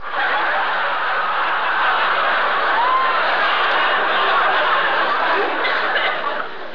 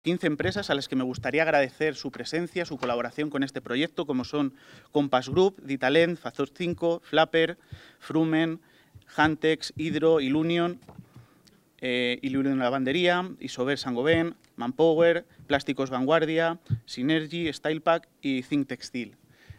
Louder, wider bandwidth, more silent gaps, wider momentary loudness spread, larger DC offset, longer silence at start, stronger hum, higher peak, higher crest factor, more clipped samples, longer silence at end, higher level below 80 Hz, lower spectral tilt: first, -17 LUFS vs -27 LUFS; second, 5.4 kHz vs 12.5 kHz; neither; second, 3 LU vs 10 LU; first, 3% vs under 0.1%; about the same, 0 s vs 0.05 s; neither; about the same, -6 dBFS vs -6 dBFS; second, 12 dB vs 20 dB; neither; about the same, 0 s vs 0.05 s; second, -68 dBFS vs -62 dBFS; second, -3.5 dB/octave vs -6 dB/octave